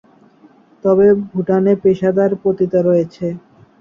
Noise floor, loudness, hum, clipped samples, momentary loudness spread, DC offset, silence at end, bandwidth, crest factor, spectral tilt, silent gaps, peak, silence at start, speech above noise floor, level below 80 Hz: -48 dBFS; -15 LUFS; none; under 0.1%; 11 LU; under 0.1%; 0.4 s; 6.8 kHz; 14 dB; -10 dB/octave; none; -2 dBFS; 0.85 s; 34 dB; -54 dBFS